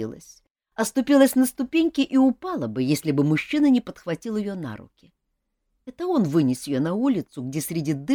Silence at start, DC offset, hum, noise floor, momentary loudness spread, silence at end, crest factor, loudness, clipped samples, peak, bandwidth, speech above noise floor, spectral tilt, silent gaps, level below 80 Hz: 0 s; under 0.1%; none; -77 dBFS; 12 LU; 0 s; 18 dB; -23 LUFS; under 0.1%; -4 dBFS; over 20 kHz; 54 dB; -6 dB/octave; 0.50-0.55 s; -60 dBFS